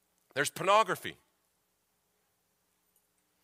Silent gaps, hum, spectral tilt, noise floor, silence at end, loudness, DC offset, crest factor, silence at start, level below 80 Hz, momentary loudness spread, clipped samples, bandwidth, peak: none; none; -2.5 dB/octave; -77 dBFS; 2.3 s; -30 LUFS; under 0.1%; 24 dB; 0.35 s; -80 dBFS; 13 LU; under 0.1%; 16 kHz; -12 dBFS